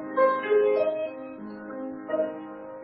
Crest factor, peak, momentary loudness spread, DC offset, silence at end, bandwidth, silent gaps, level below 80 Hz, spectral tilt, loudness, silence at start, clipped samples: 16 dB; -12 dBFS; 17 LU; under 0.1%; 0 s; 5.6 kHz; none; -72 dBFS; -9 dB/octave; -26 LUFS; 0 s; under 0.1%